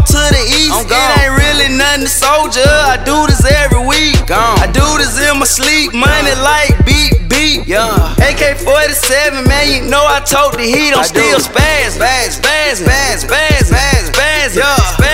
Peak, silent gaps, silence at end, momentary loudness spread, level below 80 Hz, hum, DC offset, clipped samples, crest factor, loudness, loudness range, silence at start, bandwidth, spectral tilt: 0 dBFS; none; 0 s; 2 LU; -16 dBFS; none; under 0.1%; 0.4%; 10 dB; -9 LUFS; 1 LU; 0 s; 16.5 kHz; -3.5 dB/octave